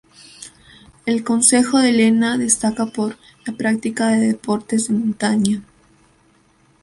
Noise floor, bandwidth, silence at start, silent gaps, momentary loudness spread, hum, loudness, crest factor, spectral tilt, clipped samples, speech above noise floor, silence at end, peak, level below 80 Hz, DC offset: -56 dBFS; 11.5 kHz; 0.4 s; none; 17 LU; none; -17 LUFS; 18 dB; -3.5 dB/octave; under 0.1%; 39 dB; 1.2 s; 0 dBFS; -58 dBFS; under 0.1%